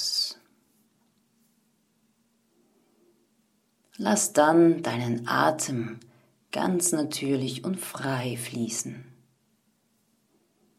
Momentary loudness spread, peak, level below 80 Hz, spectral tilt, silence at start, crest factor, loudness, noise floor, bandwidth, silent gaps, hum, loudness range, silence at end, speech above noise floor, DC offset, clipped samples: 15 LU; -6 dBFS; -74 dBFS; -4 dB/octave; 0 s; 22 dB; -26 LUFS; -70 dBFS; 15 kHz; none; none; 9 LU; 1.75 s; 44 dB; under 0.1%; under 0.1%